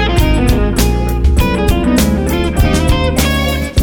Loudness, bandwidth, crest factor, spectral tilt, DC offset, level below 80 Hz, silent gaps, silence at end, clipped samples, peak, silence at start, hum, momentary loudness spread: -13 LUFS; over 20 kHz; 10 dB; -5.5 dB/octave; under 0.1%; -16 dBFS; none; 0 s; under 0.1%; 0 dBFS; 0 s; none; 2 LU